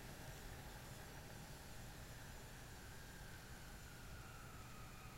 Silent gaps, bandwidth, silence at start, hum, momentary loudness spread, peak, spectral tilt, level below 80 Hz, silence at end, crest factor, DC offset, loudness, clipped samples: none; 16 kHz; 0 s; none; 2 LU; -40 dBFS; -4 dB/octave; -60 dBFS; 0 s; 14 dB; under 0.1%; -56 LUFS; under 0.1%